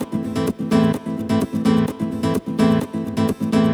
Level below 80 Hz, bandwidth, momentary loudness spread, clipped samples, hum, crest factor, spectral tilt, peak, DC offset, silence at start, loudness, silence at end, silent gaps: -46 dBFS; 15.5 kHz; 5 LU; under 0.1%; none; 14 dB; -7 dB/octave; -4 dBFS; under 0.1%; 0 s; -20 LUFS; 0 s; none